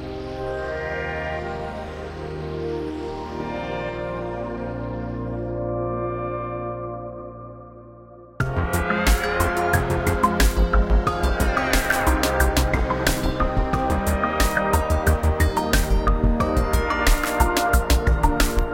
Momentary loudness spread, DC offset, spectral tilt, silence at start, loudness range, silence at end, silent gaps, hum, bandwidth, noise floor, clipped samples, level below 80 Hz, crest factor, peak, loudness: 11 LU; under 0.1%; -5 dB/octave; 0 s; 9 LU; 0 s; none; none; 17 kHz; -44 dBFS; under 0.1%; -26 dBFS; 20 dB; -2 dBFS; -23 LUFS